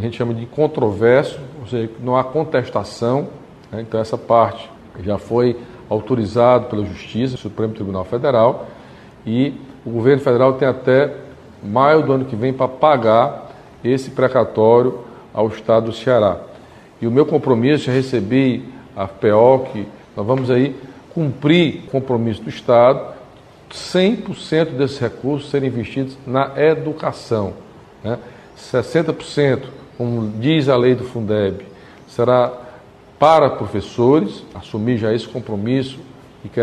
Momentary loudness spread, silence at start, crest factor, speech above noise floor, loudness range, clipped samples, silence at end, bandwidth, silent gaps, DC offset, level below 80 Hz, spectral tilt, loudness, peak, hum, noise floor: 15 LU; 0 s; 18 dB; 26 dB; 4 LU; under 0.1%; 0 s; 10.5 kHz; none; under 0.1%; -52 dBFS; -7.5 dB/octave; -17 LUFS; 0 dBFS; none; -42 dBFS